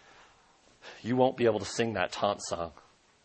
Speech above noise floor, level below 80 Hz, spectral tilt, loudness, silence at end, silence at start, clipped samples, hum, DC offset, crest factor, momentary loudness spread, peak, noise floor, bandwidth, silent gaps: 33 dB; -64 dBFS; -4.5 dB/octave; -30 LUFS; 0.55 s; 0.85 s; under 0.1%; none; under 0.1%; 22 dB; 15 LU; -10 dBFS; -62 dBFS; 8.8 kHz; none